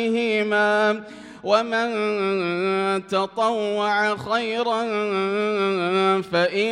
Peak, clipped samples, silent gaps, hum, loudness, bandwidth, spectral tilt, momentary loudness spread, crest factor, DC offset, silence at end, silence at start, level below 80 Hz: -6 dBFS; under 0.1%; none; none; -22 LUFS; 11 kHz; -5 dB/octave; 4 LU; 16 dB; under 0.1%; 0 s; 0 s; -68 dBFS